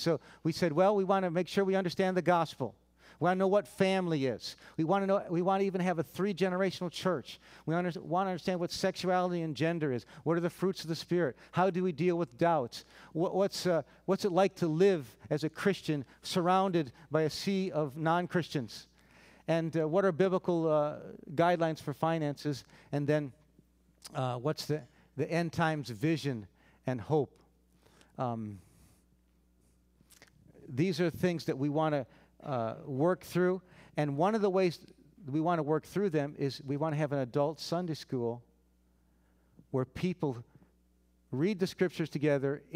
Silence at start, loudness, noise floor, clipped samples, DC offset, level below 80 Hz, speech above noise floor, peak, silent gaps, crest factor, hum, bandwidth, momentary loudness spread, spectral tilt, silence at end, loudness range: 0 s; -32 LUFS; -69 dBFS; under 0.1%; under 0.1%; -68 dBFS; 37 dB; -14 dBFS; none; 18 dB; none; 16 kHz; 10 LU; -6.5 dB/octave; 0 s; 6 LU